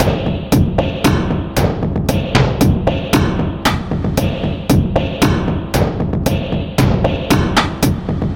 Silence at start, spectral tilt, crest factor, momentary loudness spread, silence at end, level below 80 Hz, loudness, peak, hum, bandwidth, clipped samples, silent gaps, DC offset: 0 s; -6 dB/octave; 14 dB; 4 LU; 0 s; -26 dBFS; -16 LUFS; 0 dBFS; none; 17 kHz; under 0.1%; none; under 0.1%